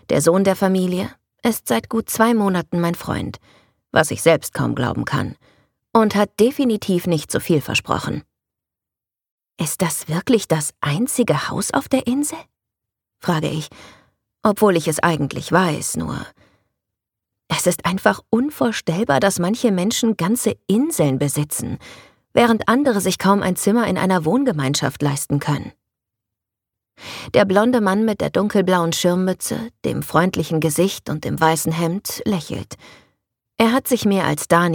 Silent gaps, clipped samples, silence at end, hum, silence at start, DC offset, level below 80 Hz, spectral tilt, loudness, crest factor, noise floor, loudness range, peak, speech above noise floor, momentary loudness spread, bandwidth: 9.31-9.38 s; under 0.1%; 0 s; none; 0.1 s; under 0.1%; -52 dBFS; -5 dB/octave; -19 LUFS; 18 dB; -88 dBFS; 4 LU; -2 dBFS; 69 dB; 9 LU; 19 kHz